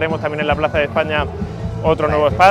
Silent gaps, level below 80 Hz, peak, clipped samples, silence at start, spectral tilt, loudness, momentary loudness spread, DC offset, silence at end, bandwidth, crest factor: none; -34 dBFS; 0 dBFS; under 0.1%; 0 s; -6.5 dB/octave; -18 LUFS; 8 LU; under 0.1%; 0 s; 14.5 kHz; 16 dB